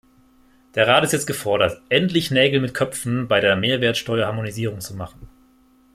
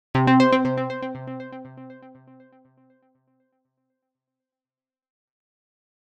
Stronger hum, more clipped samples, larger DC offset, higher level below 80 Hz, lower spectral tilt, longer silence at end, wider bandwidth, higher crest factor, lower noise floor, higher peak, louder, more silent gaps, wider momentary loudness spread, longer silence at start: neither; neither; neither; first, -54 dBFS vs -60 dBFS; second, -4.5 dB/octave vs -7.5 dB/octave; second, 0.65 s vs 4 s; first, 16 kHz vs 8.4 kHz; about the same, 20 dB vs 22 dB; second, -55 dBFS vs under -90 dBFS; first, -2 dBFS vs -6 dBFS; about the same, -20 LUFS vs -21 LUFS; neither; second, 11 LU vs 25 LU; first, 0.75 s vs 0.15 s